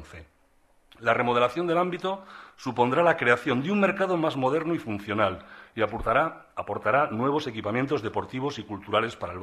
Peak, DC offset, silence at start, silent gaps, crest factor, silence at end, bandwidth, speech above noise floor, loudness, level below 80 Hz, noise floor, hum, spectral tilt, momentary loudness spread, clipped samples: -8 dBFS; under 0.1%; 0 s; none; 20 dB; 0 s; 13 kHz; 37 dB; -26 LUFS; -54 dBFS; -63 dBFS; none; -6.5 dB/octave; 11 LU; under 0.1%